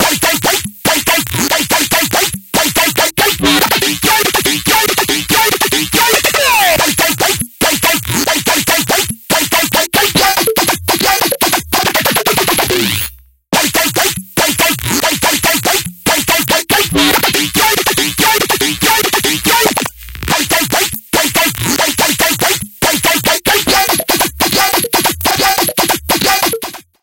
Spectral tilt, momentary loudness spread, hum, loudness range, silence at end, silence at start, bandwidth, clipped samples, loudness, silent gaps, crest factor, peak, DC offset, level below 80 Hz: -2 dB/octave; 4 LU; none; 2 LU; 0.2 s; 0 s; 18 kHz; under 0.1%; -11 LUFS; none; 12 dB; 0 dBFS; under 0.1%; -36 dBFS